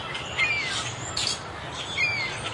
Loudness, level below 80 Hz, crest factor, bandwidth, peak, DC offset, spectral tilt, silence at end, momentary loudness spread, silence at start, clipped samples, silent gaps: -26 LUFS; -52 dBFS; 18 dB; 11.5 kHz; -12 dBFS; under 0.1%; -1.5 dB/octave; 0 s; 8 LU; 0 s; under 0.1%; none